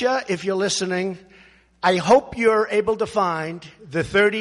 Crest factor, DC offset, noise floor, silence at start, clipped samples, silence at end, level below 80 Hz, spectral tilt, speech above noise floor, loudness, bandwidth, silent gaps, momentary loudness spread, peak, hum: 16 dB; under 0.1%; -52 dBFS; 0 s; under 0.1%; 0 s; -54 dBFS; -4 dB/octave; 31 dB; -21 LUFS; 11.5 kHz; none; 12 LU; -4 dBFS; none